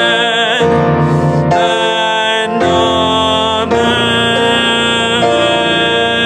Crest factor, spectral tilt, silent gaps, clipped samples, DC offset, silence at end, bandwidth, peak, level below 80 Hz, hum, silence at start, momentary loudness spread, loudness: 12 dB; -4.5 dB/octave; none; under 0.1%; under 0.1%; 0 s; 12 kHz; 0 dBFS; -46 dBFS; none; 0 s; 2 LU; -11 LUFS